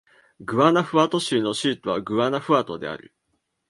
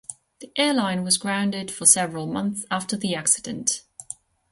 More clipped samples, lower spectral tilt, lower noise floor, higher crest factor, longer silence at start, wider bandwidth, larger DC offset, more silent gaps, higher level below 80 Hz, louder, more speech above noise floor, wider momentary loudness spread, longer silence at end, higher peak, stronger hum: neither; first, -5 dB/octave vs -2.5 dB/octave; first, -74 dBFS vs -43 dBFS; about the same, 20 dB vs 24 dB; first, 0.4 s vs 0.1 s; about the same, 11.5 kHz vs 12 kHz; neither; neither; about the same, -64 dBFS vs -64 dBFS; about the same, -22 LUFS vs -22 LUFS; first, 52 dB vs 20 dB; second, 14 LU vs 22 LU; first, 0.75 s vs 0.4 s; about the same, -2 dBFS vs 0 dBFS; neither